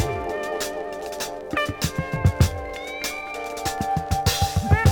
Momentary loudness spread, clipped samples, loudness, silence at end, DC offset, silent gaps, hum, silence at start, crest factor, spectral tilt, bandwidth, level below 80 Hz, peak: 10 LU; under 0.1%; -25 LUFS; 0 s; under 0.1%; none; none; 0 s; 20 dB; -5 dB/octave; over 20 kHz; -36 dBFS; -4 dBFS